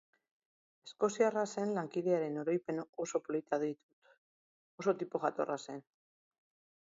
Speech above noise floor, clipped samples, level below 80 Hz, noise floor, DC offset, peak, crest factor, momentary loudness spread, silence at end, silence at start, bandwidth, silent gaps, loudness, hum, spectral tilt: over 55 dB; under 0.1%; -86 dBFS; under -90 dBFS; under 0.1%; -18 dBFS; 20 dB; 13 LU; 1.05 s; 0.85 s; 7.6 kHz; 2.89-2.93 s, 3.83-4.02 s, 4.18-4.78 s; -36 LUFS; none; -5.5 dB/octave